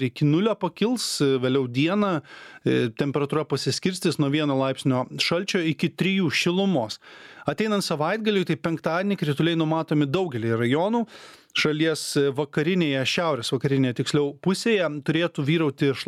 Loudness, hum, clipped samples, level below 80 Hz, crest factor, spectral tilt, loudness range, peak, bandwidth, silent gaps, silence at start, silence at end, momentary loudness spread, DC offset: -24 LUFS; none; under 0.1%; -66 dBFS; 16 dB; -5.5 dB/octave; 1 LU; -8 dBFS; 15 kHz; none; 0 s; 0.05 s; 4 LU; under 0.1%